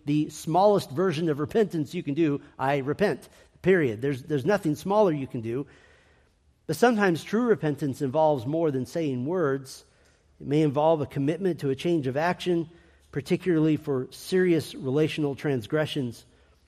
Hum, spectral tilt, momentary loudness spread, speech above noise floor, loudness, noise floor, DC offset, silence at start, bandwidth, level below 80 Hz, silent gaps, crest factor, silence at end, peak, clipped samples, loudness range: none; -6.5 dB/octave; 9 LU; 38 dB; -26 LUFS; -63 dBFS; under 0.1%; 0.05 s; 15 kHz; -62 dBFS; none; 18 dB; 0.5 s; -8 dBFS; under 0.1%; 2 LU